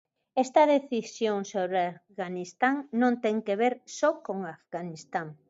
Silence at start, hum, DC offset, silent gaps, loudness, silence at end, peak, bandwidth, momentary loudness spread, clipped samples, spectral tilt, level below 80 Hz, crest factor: 0.35 s; none; under 0.1%; none; -28 LUFS; 0.15 s; -8 dBFS; 8 kHz; 13 LU; under 0.1%; -5 dB/octave; -82 dBFS; 20 dB